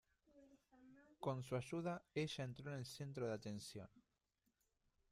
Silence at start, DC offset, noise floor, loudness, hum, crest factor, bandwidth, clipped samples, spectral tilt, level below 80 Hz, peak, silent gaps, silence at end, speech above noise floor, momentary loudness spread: 0.35 s; under 0.1%; -87 dBFS; -48 LUFS; none; 20 dB; 14.5 kHz; under 0.1%; -6 dB/octave; -78 dBFS; -30 dBFS; none; 1.1 s; 40 dB; 17 LU